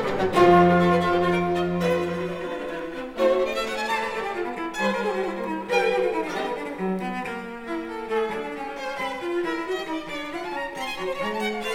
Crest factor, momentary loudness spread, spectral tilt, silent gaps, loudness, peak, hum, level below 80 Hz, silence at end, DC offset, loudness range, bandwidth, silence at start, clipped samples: 18 dB; 12 LU; -6 dB/octave; none; -25 LUFS; -6 dBFS; none; -52 dBFS; 0 s; under 0.1%; 7 LU; 15.5 kHz; 0 s; under 0.1%